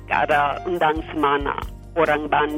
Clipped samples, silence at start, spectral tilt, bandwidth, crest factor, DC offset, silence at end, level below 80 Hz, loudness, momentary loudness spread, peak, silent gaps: under 0.1%; 0 s; -6 dB/octave; 16.5 kHz; 16 dB; under 0.1%; 0 s; -38 dBFS; -21 LUFS; 8 LU; -6 dBFS; none